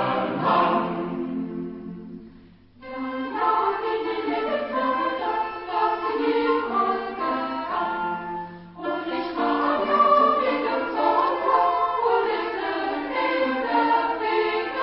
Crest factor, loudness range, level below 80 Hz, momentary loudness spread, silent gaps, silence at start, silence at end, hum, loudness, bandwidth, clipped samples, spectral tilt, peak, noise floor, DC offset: 18 dB; 6 LU; -60 dBFS; 11 LU; none; 0 s; 0 s; none; -24 LUFS; 5.8 kHz; under 0.1%; -9.5 dB/octave; -6 dBFS; -50 dBFS; under 0.1%